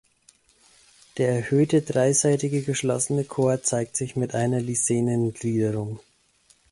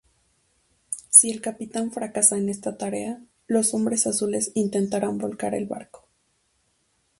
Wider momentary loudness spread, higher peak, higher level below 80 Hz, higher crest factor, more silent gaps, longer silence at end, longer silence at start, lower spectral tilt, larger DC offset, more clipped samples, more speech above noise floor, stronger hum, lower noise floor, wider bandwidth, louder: second, 6 LU vs 19 LU; second, -8 dBFS vs 0 dBFS; first, -60 dBFS vs -66 dBFS; second, 16 dB vs 26 dB; neither; second, 0.7 s vs 1.35 s; first, 1.15 s vs 0.9 s; first, -5.5 dB/octave vs -3.5 dB/octave; neither; neither; second, 38 dB vs 44 dB; neither; second, -61 dBFS vs -69 dBFS; about the same, 11.5 kHz vs 12 kHz; about the same, -24 LUFS vs -22 LUFS